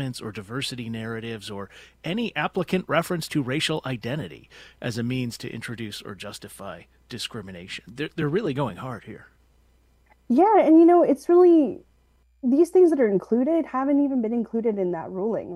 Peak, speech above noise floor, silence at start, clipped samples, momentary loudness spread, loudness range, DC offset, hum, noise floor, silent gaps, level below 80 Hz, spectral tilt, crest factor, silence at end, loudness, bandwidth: -6 dBFS; 38 dB; 0 s; under 0.1%; 20 LU; 14 LU; under 0.1%; none; -61 dBFS; none; -60 dBFS; -6 dB/octave; 18 dB; 0 s; -23 LUFS; 15 kHz